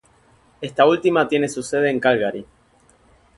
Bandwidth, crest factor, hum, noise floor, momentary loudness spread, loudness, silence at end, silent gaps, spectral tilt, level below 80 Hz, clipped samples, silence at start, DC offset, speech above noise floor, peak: 11.5 kHz; 20 dB; none; -56 dBFS; 13 LU; -19 LUFS; 0.95 s; none; -5 dB/octave; -60 dBFS; under 0.1%; 0.6 s; under 0.1%; 38 dB; 0 dBFS